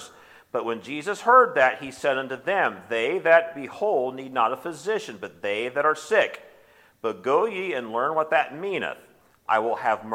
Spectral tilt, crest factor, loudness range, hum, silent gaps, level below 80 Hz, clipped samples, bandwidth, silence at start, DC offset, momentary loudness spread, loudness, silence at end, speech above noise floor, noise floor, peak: -4 dB/octave; 20 dB; 5 LU; none; none; -74 dBFS; under 0.1%; 15.5 kHz; 0 s; under 0.1%; 13 LU; -24 LUFS; 0 s; 32 dB; -56 dBFS; -4 dBFS